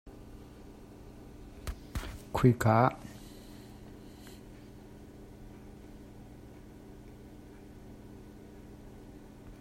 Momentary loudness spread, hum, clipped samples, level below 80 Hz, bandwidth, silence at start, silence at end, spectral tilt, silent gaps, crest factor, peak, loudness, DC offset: 25 LU; none; under 0.1%; -52 dBFS; 16 kHz; 0.05 s; 0 s; -7.5 dB/octave; none; 26 dB; -10 dBFS; -30 LUFS; under 0.1%